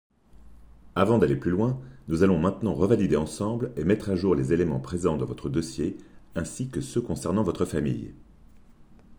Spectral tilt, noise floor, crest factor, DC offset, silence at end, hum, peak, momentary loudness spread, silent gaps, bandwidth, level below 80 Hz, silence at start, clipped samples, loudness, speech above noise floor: -7 dB/octave; -51 dBFS; 20 dB; under 0.1%; 0.05 s; none; -6 dBFS; 11 LU; none; over 20 kHz; -50 dBFS; 0.4 s; under 0.1%; -26 LUFS; 26 dB